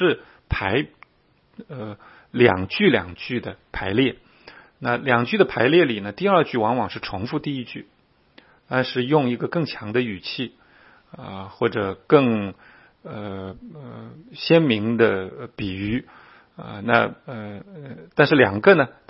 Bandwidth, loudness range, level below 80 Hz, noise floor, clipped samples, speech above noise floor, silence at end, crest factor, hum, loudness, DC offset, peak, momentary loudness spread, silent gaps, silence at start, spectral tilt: 5.8 kHz; 4 LU; -48 dBFS; -61 dBFS; under 0.1%; 40 dB; 0.2 s; 22 dB; none; -21 LUFS; under 0.1%; 0 dBFS; 20 LU; none; 0 s; -10 dB/octave